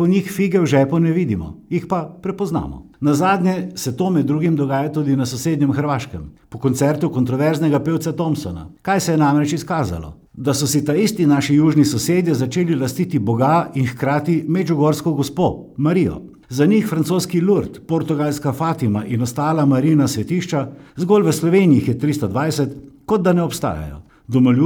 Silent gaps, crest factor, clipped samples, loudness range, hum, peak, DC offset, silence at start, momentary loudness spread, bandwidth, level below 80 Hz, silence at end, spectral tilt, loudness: none; 14 dB; under 0.1%; 3 LU; none; -2 dBFS; under 0.1%; 0 s; 9 LU; 19.5 kHz; -46 dBFS; 0 s; -6.5 dB/octave; -18 LUFS